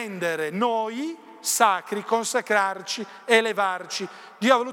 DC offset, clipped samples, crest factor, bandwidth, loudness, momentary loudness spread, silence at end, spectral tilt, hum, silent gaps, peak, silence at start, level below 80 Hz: under 0.1%; under 0.1%; 22 dB; 18 kHz; -24 LUFS; 11 LU; 0 s; -2.5 dB/octave; none; none; -4 dBFS; 0 s; -84 dBFS